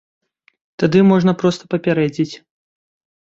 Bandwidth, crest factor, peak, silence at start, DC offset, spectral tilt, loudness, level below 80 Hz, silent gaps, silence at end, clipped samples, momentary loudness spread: 7.8 kHz; 16 dB; -2 dBFS; 0.8 s; under 0.1%; -7.5 dB/octave; -16 LUFS; -56 dBFS; none; 0.85 s; under 0.1%; 11 LU